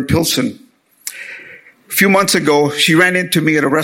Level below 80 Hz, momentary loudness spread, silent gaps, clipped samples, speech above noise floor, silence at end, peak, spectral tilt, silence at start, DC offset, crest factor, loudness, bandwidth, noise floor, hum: -46 dBFS; 19 LU; none; under 0.1%; 27 dB; 0 s; 0 dBFS; -4 dB/octave; 0 s; under 0.1%; 14 dB; -13 LUFS; 17 kHz; -40 dBFS; none